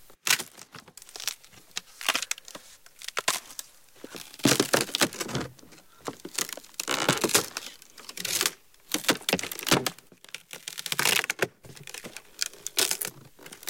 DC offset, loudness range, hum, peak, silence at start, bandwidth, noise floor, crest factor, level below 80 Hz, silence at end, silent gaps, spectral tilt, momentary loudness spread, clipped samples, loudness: 0.1%; 5 LU; none; -6 dBFS; 0.1 s; 17 kHz; -53 dBFS; 24 dB; -66 dBFS; 0 s; none; -1.5 dB/octave; 20 LU; under 0.1%; -27 LUFS